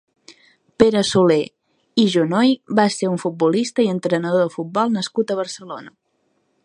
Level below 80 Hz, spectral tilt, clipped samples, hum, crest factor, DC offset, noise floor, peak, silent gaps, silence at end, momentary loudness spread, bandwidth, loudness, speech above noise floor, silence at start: -58 dBFS; -5.5 dB/octave; under 0.1%; none; 20 dB; under 0.1%; -67 dBFS; 0 dBFS; none; 0.75 s; 9 LU; 11 kHz; -19 LUFS; 49 dB; 0.3 s